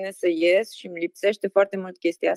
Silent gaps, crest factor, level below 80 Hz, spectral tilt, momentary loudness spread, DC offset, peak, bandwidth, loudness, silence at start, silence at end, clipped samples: none; 16 dB; -80 dBFS; -5 dB/octave; 11 LU; under 0.1%; -6 dBFS; 12.5 kHz; -24 LUFS; 0 s; 0 s; under 0.1%